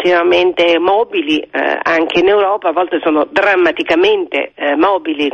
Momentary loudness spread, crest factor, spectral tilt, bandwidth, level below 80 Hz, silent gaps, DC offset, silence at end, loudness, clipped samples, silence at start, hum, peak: 5 LU; 10 dB; -4.5 dB/octave; 7.2 kHz; -52 dBFS; none; under 0.1%; 0 s; -13 LUFS; under 0.1%; 0 s; none; -2 dBFS